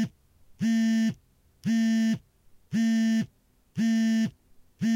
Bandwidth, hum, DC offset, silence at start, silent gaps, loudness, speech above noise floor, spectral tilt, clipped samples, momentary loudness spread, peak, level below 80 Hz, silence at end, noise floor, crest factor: 12 kHz; none; under 0.1%; 0 s; none; -27 LUFS; 39 dB; -5.5 dB/octave; under 0.1%; 10 LU; -18 dBFS; -66 dBFS; 0 s; -63 dBFS; 8 dB